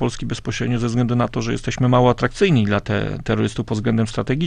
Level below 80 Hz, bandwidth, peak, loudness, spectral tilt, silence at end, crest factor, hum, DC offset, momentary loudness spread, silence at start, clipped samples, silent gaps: -36 dBFS; 10 kHz; -2 dBFS; -20 LUFS; -6.5 dB/octave; 0 s; 16 dB; none; under 0.1%; 8 LU; 0 s; under 0.1%; none